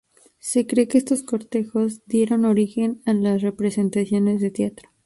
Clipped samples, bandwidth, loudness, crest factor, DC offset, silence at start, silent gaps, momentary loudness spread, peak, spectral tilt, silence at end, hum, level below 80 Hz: under 0.1%; 11.5 kHz; -21 LUFS; 16 dB; under 0.1%; 0.45 s; none; 6 LU; -6 dBFS; -6.5 dB/octave; 0.35 s; none; -62 dBFS